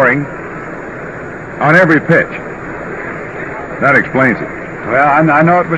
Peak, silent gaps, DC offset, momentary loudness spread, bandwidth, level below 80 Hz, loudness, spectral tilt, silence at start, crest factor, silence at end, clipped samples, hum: 0 dBFS; none; 0.5%; 16 LU; 9 kHz; -44 dBFS; -12 LUFS; -8 dB/octave; 0 s; 12 dB; 0 s; 0.3%; none